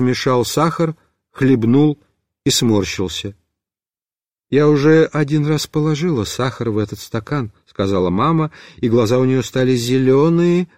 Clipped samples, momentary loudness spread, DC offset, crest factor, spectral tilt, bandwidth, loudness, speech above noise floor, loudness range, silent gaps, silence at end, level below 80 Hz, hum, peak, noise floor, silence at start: under 0.1%; 10 LU; 0.3%; 14 dB; -6 dB/octave; 16 kHz; -17 LUFS; over 74 dB; 3 LU; none; 0.15 s; -48 dBFS; none; -4 dBFS; under -90 dBFS; 0 s